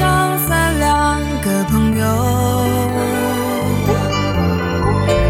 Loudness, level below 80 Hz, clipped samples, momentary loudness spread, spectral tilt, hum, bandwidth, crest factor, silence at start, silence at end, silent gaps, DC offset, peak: -16 LUFS; -28 dBFS; under 0.1%; 3 LU; -5.5 dB/octave; none; 17 kHz; 12 dB; 0 s; 0 s; none; under 0.1%; -4 dBFS